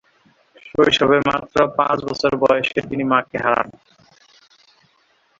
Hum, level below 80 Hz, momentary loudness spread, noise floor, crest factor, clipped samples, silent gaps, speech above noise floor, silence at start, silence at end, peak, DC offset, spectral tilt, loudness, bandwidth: none; -52 dBFS; 7 LU; -60 dBFS; 18 dB; under 0.1%; none; 43 dB; 0.65 s; 1.7 s; -2 dBFS; under 0.1%; -5 dB/octave; -18 LUFS; 7.8 kHz